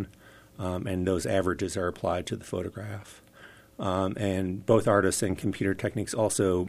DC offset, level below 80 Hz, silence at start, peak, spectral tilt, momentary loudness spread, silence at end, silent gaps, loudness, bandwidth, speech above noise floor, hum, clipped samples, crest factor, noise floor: under 0.1%; -54 dBFS; 0 s; -8 dBFS; -5.5 dB/octave; 13 LU; 0 s; none; -28 LUFS; 15.5 kHz; 26 dB; none; under 0.1%; 20 dB; -53 dBFS